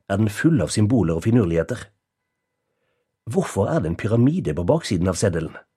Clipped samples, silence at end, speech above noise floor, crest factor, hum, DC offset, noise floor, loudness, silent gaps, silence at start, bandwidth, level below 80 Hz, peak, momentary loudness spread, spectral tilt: under 0.1%; 0.15 s; 58 dB; 18 dB; none; under 0.1%; -78 dBFS; -21 LUFS; none; 0.1 s; 13.5 kHz; -44 dBFS; -2 dBFS; 6 LU; -6.5 dB/octave